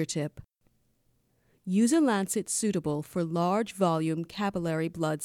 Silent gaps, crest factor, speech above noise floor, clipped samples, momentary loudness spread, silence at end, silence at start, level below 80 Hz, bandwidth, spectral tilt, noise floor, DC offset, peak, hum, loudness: none; 18 dB; 42 dB; under 0.1%; 7 LU; 0 s; 0 s; -64 dBFS; 17 kHz; -5.5 dB/octave; -70 dBFS; under 0.1%; -12 dBFS; none; -28 LUFS